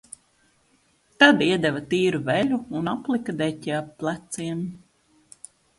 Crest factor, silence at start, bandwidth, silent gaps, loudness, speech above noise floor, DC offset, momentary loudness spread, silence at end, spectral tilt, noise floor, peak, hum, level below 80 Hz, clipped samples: 24 dB; 1.2 s; 11.5 kHz; none; -23 LUFS; 40 dB; under 0.1%; 14 LU; 1 s; -5 dB/octave; -64 dBFS; -2 dBFS; none; -62 dBFS; under 0.1%